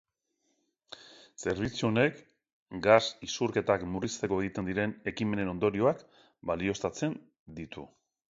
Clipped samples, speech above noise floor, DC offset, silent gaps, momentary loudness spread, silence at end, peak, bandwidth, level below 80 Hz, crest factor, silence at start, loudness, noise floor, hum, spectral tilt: under 0.1%; 48 dB; under 0.1%; 2.53-2.66 s, 7.39-7.46 s; 20 LU; 0.45 s; -8 dBFS; 7.8 kHz; -58 dBFS; 24 dB; 0.9 s; -30 LUFS; -78 dBFS; none; -5 dB/octave